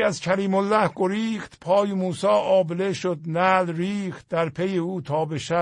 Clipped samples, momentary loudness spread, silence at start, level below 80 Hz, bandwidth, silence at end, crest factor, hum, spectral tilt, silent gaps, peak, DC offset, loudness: under 0.1%; 7 LU; 0 s; -62 dBFS; 10.5 kHz; 0 s; 18 dB; none; -6 dB/octave; none; -6 dBFS; under 0.1%; -23 LUFS